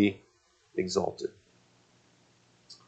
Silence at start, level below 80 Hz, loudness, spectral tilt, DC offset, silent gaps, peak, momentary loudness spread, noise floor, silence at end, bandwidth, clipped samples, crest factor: 0 s; -72 dBFS; -33 LUFS; -5 dB/octave; under 0.1%; none; -12 dBFS; 19 LU; -67 dBFS; 0.15 s; 9 kHz; under 0.1%; 22 dB